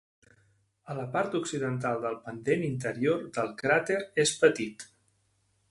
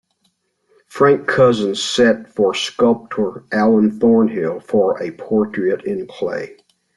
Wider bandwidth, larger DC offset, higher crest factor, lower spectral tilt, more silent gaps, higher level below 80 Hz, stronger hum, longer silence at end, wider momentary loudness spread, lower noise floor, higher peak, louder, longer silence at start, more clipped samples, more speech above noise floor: about the same, 11.5 kHz vs 11.5 kHz; neither; first, 22 dB vs 14 dB; about the same, -4.5 dB/octave vs -5 dB/octave; neither; second, -68 dBFS vs -58 dBFS; neither; first, 0.85 s vs 0.45 s; about the same, 12 LU vs 10 LU; first, -72 dBFS vs -66 dBFS; second, -8 dBFS vs -2 dBFS; second, -29 LUFS vs -17 LUFS; about the same, 0.85 s vs 0.95 s; neither; second, 43 dB vs 50 dB